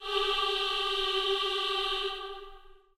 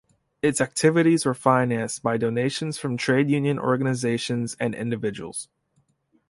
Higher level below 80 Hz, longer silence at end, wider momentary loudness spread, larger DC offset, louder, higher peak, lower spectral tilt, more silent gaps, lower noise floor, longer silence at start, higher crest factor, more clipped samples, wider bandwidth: first, -52 dBFS vs -62 dBFS; second, 0.25 s vs 0.85 s; about the same, 10 LU vs 9 LU; neither; second, -29 LUFS vs -23 LUFS; second, -16 dBFS vs -4 dBFS; second, -1 dB/octave vs -5.5 dB/octave; neither; second, -51 dBFS vs -68 dBFS; second, 0 s vs 0.45 s; about the same, 16 dB vs 20 dB; neither; first, 15.5 kHz vs 11.5 kHz